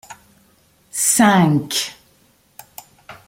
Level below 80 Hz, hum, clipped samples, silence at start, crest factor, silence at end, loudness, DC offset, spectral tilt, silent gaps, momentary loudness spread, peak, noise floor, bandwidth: -58 dBFS; none; under 0.1%; 0.1 s; 18 dB; 0.15 s; -16 LUFS; under 0.1%; -3.5 dB/octave; none; 22 LU; -2 dBFS; -56 dBFS; 16.5 kHz